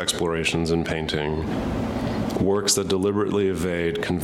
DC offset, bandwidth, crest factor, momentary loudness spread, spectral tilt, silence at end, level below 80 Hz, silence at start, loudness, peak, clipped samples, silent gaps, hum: under 0.1%; 16 kHz; 16 dB; 6 LU; -4.5 dB/octave; 0 s; -40 dBFS; 0 s; -23 LUFS; -8 dBFS; under 0.1%; none; none